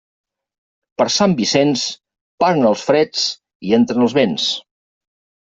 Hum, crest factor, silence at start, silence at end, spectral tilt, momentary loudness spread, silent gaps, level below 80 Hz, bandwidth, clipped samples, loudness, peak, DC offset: none; 16 dB; 1 s; 0.9 s; -4.5 dB/octave; 10 LU; 2.21-2.38 s, 3.55-3.60 s; -60 dBFS; 8 kHz; under 0.1%; -16 LUFS; -2 dBFS; under 0.1%